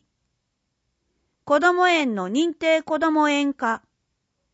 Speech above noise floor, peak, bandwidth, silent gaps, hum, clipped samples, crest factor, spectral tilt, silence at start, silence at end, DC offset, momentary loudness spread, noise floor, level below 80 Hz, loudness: 56 dB; -6 dBFS; 8 kHz; none; none; under 0.1%; 18 dB; -4 dB/octave; 1.45 s; 0.75 s; under 0.1%; 7 LU; -76 dBFS; -70 dBFS; -21 LUFS